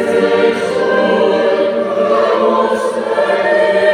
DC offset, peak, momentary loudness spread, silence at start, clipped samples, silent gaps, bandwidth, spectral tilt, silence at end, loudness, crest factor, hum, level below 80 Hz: under 0.1%; -2 dBFS; 3 LU; 0 s; under 0.1%; none; 11 kHz; -5 dB/octave; 0 s; -13 LUFS; 12 dB; none; -62 dBFS